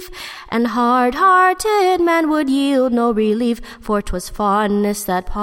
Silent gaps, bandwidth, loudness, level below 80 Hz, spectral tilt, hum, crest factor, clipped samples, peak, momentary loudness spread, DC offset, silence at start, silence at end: none; 16.5 kHz; -16 LUFS; -36 dBFS; -5 dB/octave; none; 14 dB; under 0.1%; -4 dBFS; 9 LU; under 0.1%; 0 s; 0 s